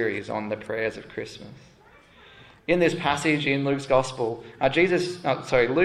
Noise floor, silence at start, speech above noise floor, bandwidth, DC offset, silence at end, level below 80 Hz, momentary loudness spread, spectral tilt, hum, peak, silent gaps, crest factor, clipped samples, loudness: -53 dBFS; 0 s; 29 dB; 12.5 kHz; under 0.1%; 0 s; -54 dBFS; 14 LU; -5.5 dB/octave; none; -6 dBFS; none; 20 dB; under 0.1%; -24 LUFS